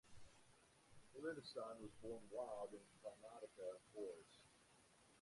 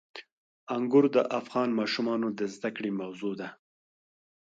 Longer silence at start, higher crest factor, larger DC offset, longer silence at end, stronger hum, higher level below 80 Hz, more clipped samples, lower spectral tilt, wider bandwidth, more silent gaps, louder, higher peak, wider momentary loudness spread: about the same, 0.05 s vs 0.15 s; about the same, 18 dB vs 20 dB; neither; second, 0 s vs 1.05 s; neither; about the same, -82 dBFS vs -80 dBFS; neither; second, -4.5 dB/octave vs -6 dB/octave; first, 11.5 kHz vs 8 kHz; second, none vs 0.32-0.67 s; second, -54 LUFS vs -29 LUFS; second, -38 dBFS vs -10 dBFS; about the same, 14 LU vs 15 LU